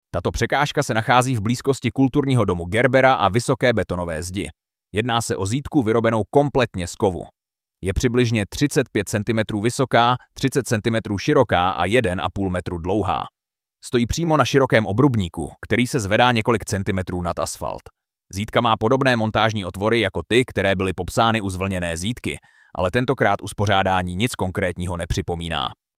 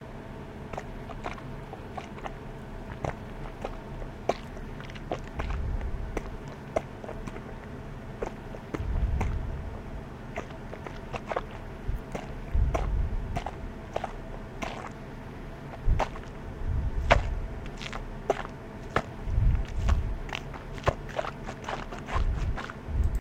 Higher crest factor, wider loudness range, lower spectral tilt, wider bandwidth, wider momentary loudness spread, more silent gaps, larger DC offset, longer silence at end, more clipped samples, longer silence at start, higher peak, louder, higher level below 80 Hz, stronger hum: second, 20 dB vs 28 dB; second, 3 LU vs 6 LU; about the same, -5.5 dB/octave vs -6.5 dB/octave; first, 16 kHz vs 10 kHz; second, 9 LU vs 12 LU; neither; neither; first, 0.25 s vs 0 s; neither; first, 0.15 s vs 0 s; about the same, -2 dBFS vs -4 dBFS; first, -21 LUFS vs -35 LUFS; second, -42 dBFS vs -34 dBFS; neither